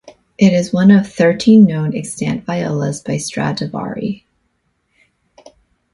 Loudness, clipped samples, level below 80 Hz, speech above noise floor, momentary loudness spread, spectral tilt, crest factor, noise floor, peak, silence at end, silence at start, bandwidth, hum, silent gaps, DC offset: -15 LUFS; under 0.1%; -52 dBFS; 52 dB; 13 LU; -6.5 dB/octave; 16 dB; -65 dBFS; 0 dBFS; 1.75 s; 0.4 s; 11.5 kHz; none; none; under 0.1%